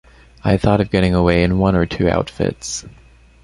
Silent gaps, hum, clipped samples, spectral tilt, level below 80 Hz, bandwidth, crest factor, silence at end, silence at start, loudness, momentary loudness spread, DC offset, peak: none; none; under 0.1%; -6 dB/octave; -32 dBFS; 11.5 kHz; 16 dB; 0.55 s; 0.45 s; -17 LUFS; 10 LU; under 0.1%; -2 dBFS